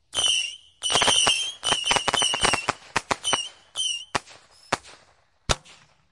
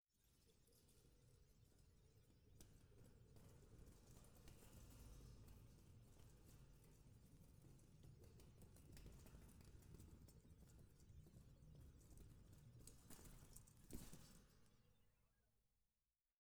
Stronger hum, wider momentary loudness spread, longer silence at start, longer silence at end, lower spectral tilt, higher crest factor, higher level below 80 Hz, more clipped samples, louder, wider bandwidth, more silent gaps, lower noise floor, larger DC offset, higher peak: neither; first, 12 LU vs 5 LU; first, 0.15 s vs 0 s; first, 0.4 s vs 0.05 s; second, -0.5 dB/octave vs -5 dB/octave; about the same, 22 dB vs 24 dB; first, -46 dBFS vs -70 dBFS; neither; first, -23 LUFS vs -67 LUFS; second, 11.5 kHz vs over 20 kHz; neither; second, -61 dBFS vs under -90 dBFS; neither; first, -4 dBFS vs -42 dBFS